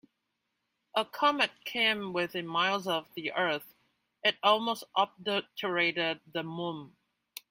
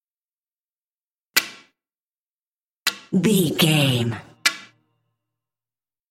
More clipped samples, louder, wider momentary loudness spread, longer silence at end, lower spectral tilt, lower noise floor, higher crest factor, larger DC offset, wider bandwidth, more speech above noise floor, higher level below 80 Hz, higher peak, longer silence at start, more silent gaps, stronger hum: neither; second, -30 LUFS vs -21 LUFS; about the same, 10 LU vs 10 LU; second, 0.65 s vs 1.45 s; about the same, -4 dB/octave vs -4 dB/octave; second, -82 dBFS vs under -90 dBFS; about the same, 22 dB vs 24 dB; neither; about the same, 16 kHz vs 16.5 kHz; second, 51 dB vs over 71 dB; second, -78 dBFS vs -66 dBFS; second, -10 dBFS vs 0 dBFS; second, 0.95 s vs 1.35 s; second, none vs 2.00-2.77 s; neither